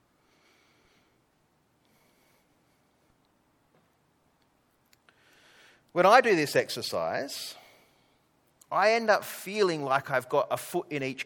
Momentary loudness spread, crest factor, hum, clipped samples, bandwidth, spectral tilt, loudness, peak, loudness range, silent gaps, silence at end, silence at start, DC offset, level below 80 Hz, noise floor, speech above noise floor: 14 LU; 24 dB; none; under 0.1%; 19 kHz; -4 dB/octave; -27 LUFS; -6 dBFS; 2 LU; none; 0 s; 5.95 s; under 0.1%; -78 dBFS; -70 dBFS; 43 dB